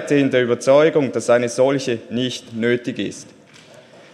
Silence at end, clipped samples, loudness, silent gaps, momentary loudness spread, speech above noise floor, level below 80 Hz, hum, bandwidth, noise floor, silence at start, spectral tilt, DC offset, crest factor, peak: 0.9 s; under 0.1%; -18 LUFS; none; 12 LU; 27 dB; -66 dBFS; none; 12 kHz; -45 dBFS; 0 s; -5 dB/octave; under 0.1%; 16 dB; -2 dBFS